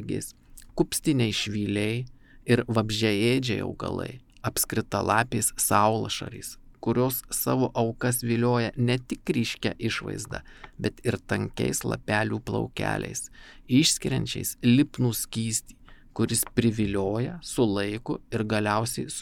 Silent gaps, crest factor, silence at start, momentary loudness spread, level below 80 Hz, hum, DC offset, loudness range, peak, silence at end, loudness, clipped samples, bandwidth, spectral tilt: none; 20 dB; 0 s; 11 LU; -50 dBFS; none; under 0.1%; 4 LU; -6 dBFS; 0 s; -26 LUFS; under 0.1%; 18 kHz; -4.5 dB/octave